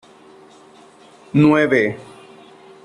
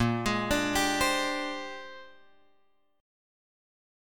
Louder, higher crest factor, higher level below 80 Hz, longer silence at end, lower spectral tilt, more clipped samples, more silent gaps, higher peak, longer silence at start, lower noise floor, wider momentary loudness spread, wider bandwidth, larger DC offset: first, -16 LUFS vs -28 LUFS; about the same, 18 dB vs 18 dB; second, -58 dBFS vs -50 dBFS; second, 0.8 s vs 1 s; first, -7.5 dB/octave vs -3.5 dB/octave; neither; neither; first, -4 dBFS vs -14 dBFS; first, 1.35 s vs 0 s; second, -46 dBFS vs -71 dBFS; second, 11 LU vs 18 LU; second, 10 kHz vs 17.5 kHz; neither